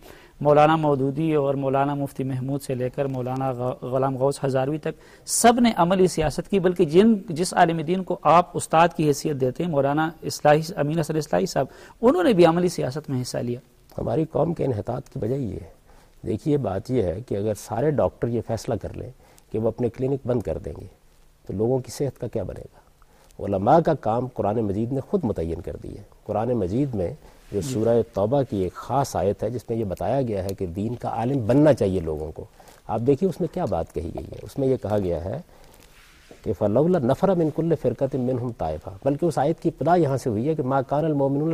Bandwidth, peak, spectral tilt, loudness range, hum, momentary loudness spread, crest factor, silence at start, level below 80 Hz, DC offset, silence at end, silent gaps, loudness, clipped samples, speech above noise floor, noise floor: 15.5 kHz; -6 dBFS; -6.5 dB/octave; 7 LU; none; 13 LU; 18 dB; 0.05 s; -48 dBFS; under 0.1%; 0 s; none; -23 LUFS; under 0.1%; 31 dB; -53 dBFS